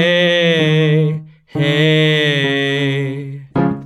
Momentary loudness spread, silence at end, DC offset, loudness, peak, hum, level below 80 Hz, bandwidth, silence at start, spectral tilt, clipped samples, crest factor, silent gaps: 11 LU; 0 s; under 0.1%; -14 LUFS; -4 dBFS; none; -52 dBFS; 10.5 kHz; 0 s; -6 dB/octave; under 0.1%; 12 dB; none